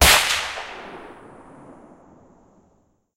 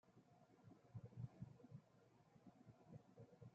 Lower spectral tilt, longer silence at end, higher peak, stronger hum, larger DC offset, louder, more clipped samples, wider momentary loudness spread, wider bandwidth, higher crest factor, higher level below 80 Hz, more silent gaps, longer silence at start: second, -1 dB/octave vs -9 dB/octave; first, 2.05 s vs 0 s; first, -4 dBFS vs -40 dBFS; neither; neither; first, -19 LUFS vs -62 LUFS; neither; first, 30 LU vs 12 LU; first, 16 kHz vs 7.4 kHz; about the same, 20 dB vs 22 dB; first, -36 dBFS vs -84 dBFS; neither; about the same, 0 s vs 0.05 s